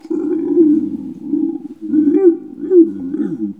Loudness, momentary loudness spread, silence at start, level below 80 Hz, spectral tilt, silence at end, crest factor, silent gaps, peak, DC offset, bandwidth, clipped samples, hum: -15 LUFS; 12 LU; 0.05 s; -64 dBFS; -10.5 dB/octave; 0.05 s; 14 dB; none; 0 dBFS; 0.1%; 2.5 kHz; under 0.1%; none